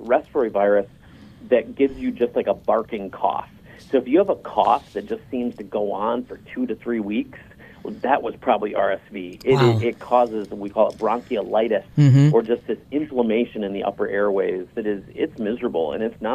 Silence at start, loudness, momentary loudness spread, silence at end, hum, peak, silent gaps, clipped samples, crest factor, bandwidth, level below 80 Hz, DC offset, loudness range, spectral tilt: 0 s; -22 LUFS; 11 LU; 0 s; none; -2 dBFS; none; under 0.1%; 18 dB; 8.4 kHz; -54 dBFS; under 0.1%; 5 LU; -8 dB/octave